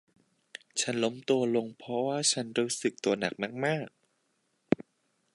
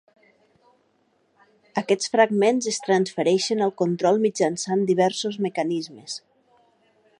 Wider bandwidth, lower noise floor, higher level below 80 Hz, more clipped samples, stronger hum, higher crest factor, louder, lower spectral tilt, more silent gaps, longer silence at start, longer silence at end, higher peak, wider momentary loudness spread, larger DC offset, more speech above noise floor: about the same, 11.5 kHz vs 11 kHz; first, -76 dBFS vs -66 dBFS; about the same, -74 dBFS vs -74 dBFS; neither; neither; first, 24 dB vs 18 dB; second, -30 LUFS vs -22 LUFS; about the same, -3.5 dB/octave vs -4.5 dB/octave; neither; second, 0.75 s vs 1.75 s; second, 0.6 s vs 1 s; about the same, -8 dBFS vs -6 dBFS; second, 8 LU vs 11 LU; neither; about the same, 45 dB vs 44 dB